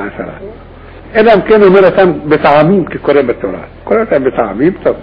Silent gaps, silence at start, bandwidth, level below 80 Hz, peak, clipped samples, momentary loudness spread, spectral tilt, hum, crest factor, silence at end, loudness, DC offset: none; 0 s; 5.2 kHz; -36 dBFS; 0 dBFS; 0.2%; 17 LU; -9 dB/octave; none; 10 dB; 0 s; -9 LUFS; under 0.1%